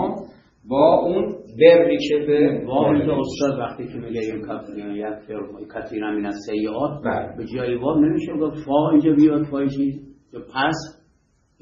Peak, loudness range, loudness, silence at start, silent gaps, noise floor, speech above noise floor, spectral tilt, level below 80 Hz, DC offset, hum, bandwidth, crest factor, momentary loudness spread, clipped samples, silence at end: 0 dBFS; 10 LU; -20 LUFS; 0 s; none; -62 dBFS; 42 dB; -7 dB/octave; -52 dBFS; under 0.1%; none; 7.6 kHz; 20 dB; 16 LU; under 0.1%; 0.7 s